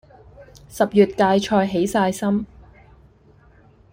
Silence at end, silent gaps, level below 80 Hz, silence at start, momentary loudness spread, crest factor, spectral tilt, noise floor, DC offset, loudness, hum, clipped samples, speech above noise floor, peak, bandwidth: 1.45 s; none; -50 dBFS; 0.4 s; 9 LU; 20 dB; -6 dB/octave; -52 dBFS; under 0.1%; -19 LUFS; none; under 0.1%; 33 dB; -2 dBFS; 16.5 kHz